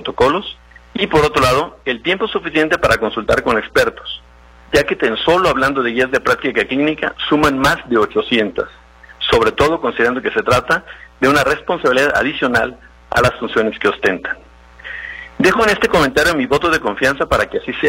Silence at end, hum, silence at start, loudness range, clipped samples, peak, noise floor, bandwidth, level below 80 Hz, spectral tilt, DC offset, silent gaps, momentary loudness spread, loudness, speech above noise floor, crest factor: 0 s; none; 0 s; 2 LU; under 0.1%; 0 dBFS; -35 dBFS; 16.5 kHz; -38 dBFS; -4.5 dB/octave; under 0.1%; none; 10 LU; -15 LUFS; 19 dB; 16 dB